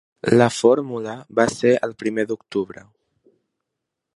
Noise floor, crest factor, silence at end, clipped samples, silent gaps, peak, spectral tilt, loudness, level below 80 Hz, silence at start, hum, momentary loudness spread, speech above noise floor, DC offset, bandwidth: -82 dBFS; 22 dB; 1.5 s; under 0.1%; none; 0 dBFS; -5.5 dB/octave; -20 LUFS; -60 dBFS; 0.25 s; none; 11 LU; 62 dB; under 0.1%; 11.5 kHz